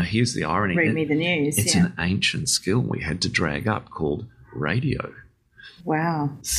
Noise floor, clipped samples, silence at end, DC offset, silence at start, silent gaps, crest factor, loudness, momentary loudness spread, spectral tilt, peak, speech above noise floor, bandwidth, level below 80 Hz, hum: -49 dBFS; under 0.1%; 0 s; under 0.1%; 0 s; none; 18 dB; -23 LUFS; 8 LU; -4 dB/octave; -6 dBFS; 26 dB; 15 kHz; -48 dBFS; none